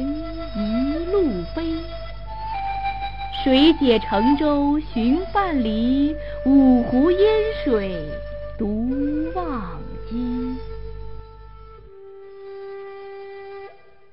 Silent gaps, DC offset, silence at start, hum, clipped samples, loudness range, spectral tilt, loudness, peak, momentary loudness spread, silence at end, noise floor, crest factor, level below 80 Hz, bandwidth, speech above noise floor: none; 2%; 0 s; none; under 0.1%; 14 LU; -8.5 dB/octave; -21 LUFS; -4 dBFS; 21 LU; 0 s; -44 dBFS; 18 dB; -36 dBFS; 5.6 kHz; 26 dB